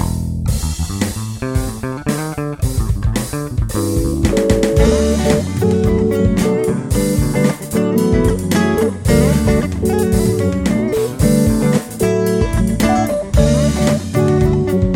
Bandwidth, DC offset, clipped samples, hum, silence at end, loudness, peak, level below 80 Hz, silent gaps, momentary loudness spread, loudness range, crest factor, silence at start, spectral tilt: 17 kHz; under 0.1%; under 0.1%; none; 0 s; -16 LUFS; 0 dBFS; -24 dBFS; none; 7 LU; 5 LU; 14 dB; 0 s; -6.5 dB/octave